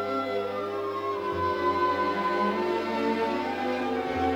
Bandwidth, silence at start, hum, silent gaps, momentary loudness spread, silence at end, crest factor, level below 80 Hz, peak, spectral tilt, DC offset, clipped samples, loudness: 17.5 kHz; 0 s; none; none; 5 LU; 0 s; 14 dB; -62 dBFS; -14 dBFS; -6 dB/octave; under 0.1%; under 0.1%; -28 LUFS